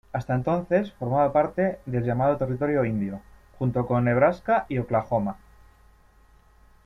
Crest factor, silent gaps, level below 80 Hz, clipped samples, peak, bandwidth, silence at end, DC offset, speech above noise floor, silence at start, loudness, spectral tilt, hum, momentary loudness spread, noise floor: 18 dB; none; -52 dBFS; under 0.1%; -8 dBFS; 7 kHz; 1.5 s; under 0.1%; 32 dB; 0.15 s; -25 LUFS; -9.5 dB/octave; none; 8 LU; -56 dBFS